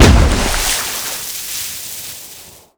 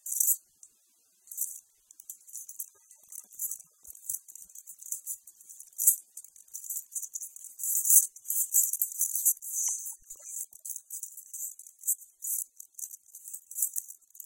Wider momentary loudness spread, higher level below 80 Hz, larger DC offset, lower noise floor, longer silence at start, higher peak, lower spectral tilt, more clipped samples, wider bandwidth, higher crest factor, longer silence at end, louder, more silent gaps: second, 16 LU vs 21 LU; first, -20 dBFS vs -82 dBFS; neither; second, -38 dBFS vs -68 dBFS; about the same, 0 s vs 0.05 s; about the same, 0 dBFS vs -2 dBFS; first, -3.5 dB/octave vs 4 dB/octave; first, 0.5% vs under 0.1%; first, over 20 kHz vs 17 kHz; second, 16 dB vs 32 dB; first, 0.3 s vs 0 s; first, -17 LUFS vs -29 LUFS; neither